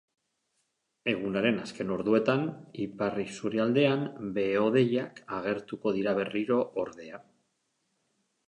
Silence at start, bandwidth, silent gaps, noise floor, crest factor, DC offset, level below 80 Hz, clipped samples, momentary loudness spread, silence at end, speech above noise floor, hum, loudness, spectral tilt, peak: 1.05 s; 10.5 kHz; none; -78 dBFS; 20 dB; under 0.1%; -68 dBFS; under 0.1%; 11 LU; 1.25 s; 49 dB; none; -29 LUFS; -6.5 dB/octave; -10 dBFS